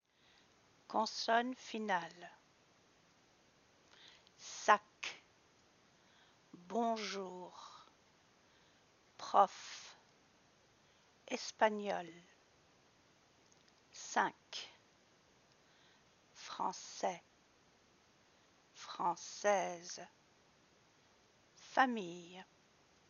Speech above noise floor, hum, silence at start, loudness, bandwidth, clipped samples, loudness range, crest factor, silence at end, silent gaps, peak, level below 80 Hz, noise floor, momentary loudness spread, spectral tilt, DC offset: 32 dB; none; 0.9 s; -38 LUFS; 7.2 kHz; under 0.1%; 6 LU; 30 dB; 0.65 s; none; -14 dBFS; -88 dBFS; -70 dBFS; 24 LU; -1.5 dB/octave; under 0.1%